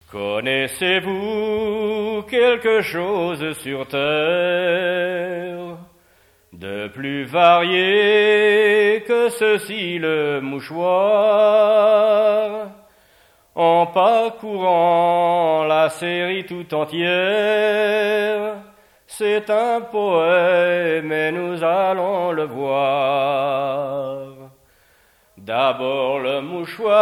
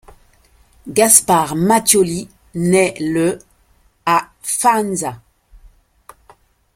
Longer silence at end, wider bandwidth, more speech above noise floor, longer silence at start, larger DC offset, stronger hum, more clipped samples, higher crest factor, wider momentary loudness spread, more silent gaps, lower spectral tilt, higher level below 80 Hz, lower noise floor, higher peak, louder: second, 0 s vs 1.6 s; about the same, 15.5 kHz vs 16.5 kHz; about the same, 38 dB vs 40 dB; second, 0.1 s vs 0.85 s; neither; neither; neither; about the same, 18 dB vs 18 dB; second, 12 LU vs 15 LU; neither; about the same, -4.5 dB/octave vs -3.5 dB/octave; second, -62 dBFS vs -50 dBFS; about the same, -56 dBFS vs -56 dBFS; about the same, 0 dBFS vs 0 dBFS; second, -18 LUFS vs -15 LUFS